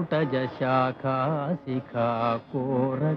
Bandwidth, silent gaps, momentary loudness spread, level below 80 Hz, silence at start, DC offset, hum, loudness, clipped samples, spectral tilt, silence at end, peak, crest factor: 5.8 kHz; none; 5 LU; -66 dBFS; 0 s; under 0.1%; none; -27 LUFS; under 0.1%; -9.5 dB/octave; 0 s; -12 dBFS; 14 dB